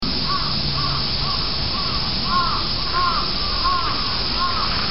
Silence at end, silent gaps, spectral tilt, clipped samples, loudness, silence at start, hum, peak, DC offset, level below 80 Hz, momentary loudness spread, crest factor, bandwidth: 0 s; none; -1.5 dB/octave; under 0.1%; -20 LUFS; 0 s; none; -8 dBFS; 4%; -32 dBFS; 2 LU; 14 dB; 5.8 kHz